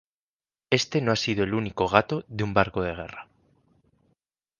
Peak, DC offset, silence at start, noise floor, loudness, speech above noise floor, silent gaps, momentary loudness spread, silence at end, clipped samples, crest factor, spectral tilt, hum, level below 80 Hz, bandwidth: -2 dBFS; under 0.1%; 0.7 s; under -90 dBFS; -25 LUFS; over 65 dB; none; 11 LU; 1.35 s; under 0.1%; 26 dB; -5 dB/octave; none; -52 dBFS; 10 kHz